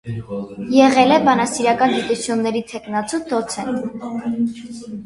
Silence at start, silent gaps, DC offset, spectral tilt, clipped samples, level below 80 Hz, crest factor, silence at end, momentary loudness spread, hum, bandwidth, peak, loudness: 0.05 s; none; under 0.1%; -4.5 dB/octave; under 0.1%; -54 dBFS; 18 dB; 0 s; 15 LU; none; 11.5 kHz; 0 dBFS; -18 LUFS